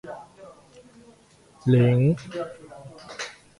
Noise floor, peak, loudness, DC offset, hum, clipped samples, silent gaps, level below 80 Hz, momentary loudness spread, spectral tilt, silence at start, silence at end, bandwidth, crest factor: -55 dBFS; -8 dBFS; -23 LUFS; under 0.1%; none; under 0.1%; none; -58 dBFS; 24 LU; -7.5 dB/octave; 0.05 s; 0.3 s; 11 kHz; 18 dB